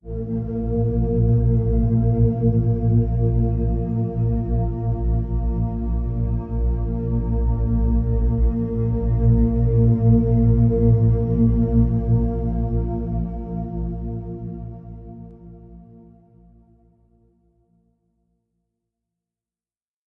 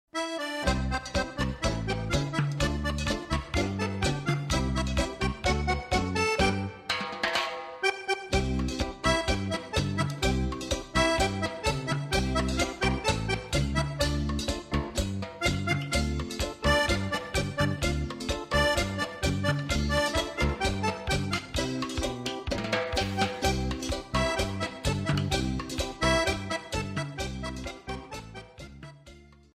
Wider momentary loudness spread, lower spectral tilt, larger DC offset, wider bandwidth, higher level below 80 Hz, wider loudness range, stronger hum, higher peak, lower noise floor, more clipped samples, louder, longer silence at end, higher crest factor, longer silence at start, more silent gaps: first, 12 LU vs 7 LU; first, -14 dB/octave vs -4.5 dB/octave; neither; second, 2 kHz vs 15 kHz; first, -26 dBFS vs -38 dBFS; first, 13 LU vs 2 LU; neither; first, -6 dBFS vs -12 dBFS; first, under -90 dBFS vs -52 dBFS; neither; first, -21 LUFS vs -29 LUFS; first, 4.25 s vs 0.3 s; about the same, 14 dB vs 16 dB; about the same, 0.05 s vs 0.15 s; neither